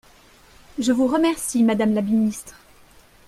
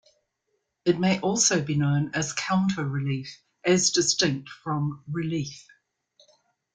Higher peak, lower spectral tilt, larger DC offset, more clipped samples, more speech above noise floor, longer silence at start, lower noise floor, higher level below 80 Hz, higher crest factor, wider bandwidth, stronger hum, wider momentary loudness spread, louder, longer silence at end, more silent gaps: about the same, -8 dBFS vs -8 dBFS; about the same, -5 dB/octave vs -4 dB/octave; neither; neither; second, 31 dB vs 52 dB; about the same, 0.75 s vs 0.85 s; second, -51 dBFS vs -77 dBFS; first, -56 dBFS vs -62 dBFS; about the same, 14 dB vs 18 dB; first, 15 kHz vs 10 kHz; neither; second, 8 LU vs 11 LU; first, -20 LUFS vs -25 LUFS; second, 0.75 s vs 1.15 s; neither